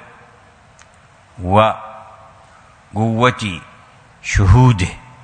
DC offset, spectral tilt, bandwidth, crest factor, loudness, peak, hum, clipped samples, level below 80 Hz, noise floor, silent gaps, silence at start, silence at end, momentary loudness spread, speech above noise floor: under 0.1%; -6.5 dB/octave; 9.6 kHz; 18 dB; -15 LUFS; 0 dBFS; none; under 0.1%; -30 dBFS; -47 dBFS; none; 1.4 s; 0.25 s; 19 LU; 34 dB